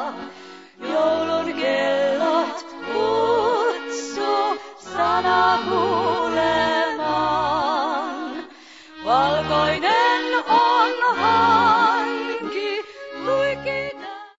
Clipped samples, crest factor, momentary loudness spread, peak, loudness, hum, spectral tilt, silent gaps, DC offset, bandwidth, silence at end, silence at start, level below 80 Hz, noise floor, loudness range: under 0.1%; 16 dB; 13 LU; -4 dBFS; -20 LUFS; none; -4 dB/octave; none; 0.1%; 8 kHz; 0.1 s; 0 s; -54 dBFS; -44 dBFS; 4 LU